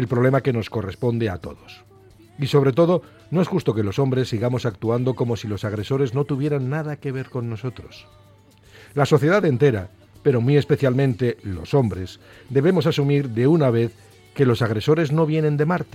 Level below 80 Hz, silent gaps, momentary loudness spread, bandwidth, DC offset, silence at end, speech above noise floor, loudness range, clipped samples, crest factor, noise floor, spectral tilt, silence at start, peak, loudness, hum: -54 dBFS; none; 11 LU; 14 kHz; under 0.1%; 0.1 s; 31 dB; 5 LU; under 0.1%; 18 dB; -51 dBFS; -8 dB/octave; 0 s; -4 dBFS; -21 LUFS; none